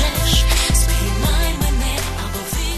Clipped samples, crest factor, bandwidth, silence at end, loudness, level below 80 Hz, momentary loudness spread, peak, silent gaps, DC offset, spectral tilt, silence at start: under 0.1%; 14 dB; 13.5 kHz; 0 s; -18 LUFS; -18 dBFS; 8 LU; -2 dBFS; none; under 0.1%; -3.5 dB/octave; 0 s